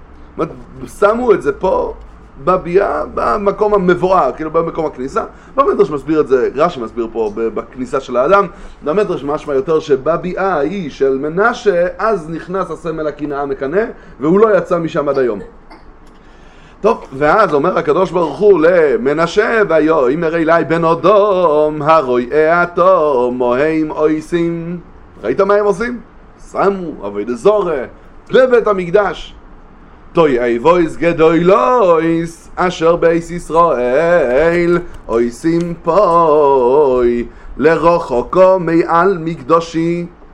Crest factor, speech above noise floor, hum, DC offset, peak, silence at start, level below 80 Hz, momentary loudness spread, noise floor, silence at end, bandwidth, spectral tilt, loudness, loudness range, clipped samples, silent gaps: 14 dB; 26 dB; none; under 0.1%; 0 dBFS; 0 s; -38 dBFS; 11 LU; -39 dBFS; 0.1 s; 11 kHz; -7 dB/octave; -13 LUFS; 5 LU; under 0.1%; none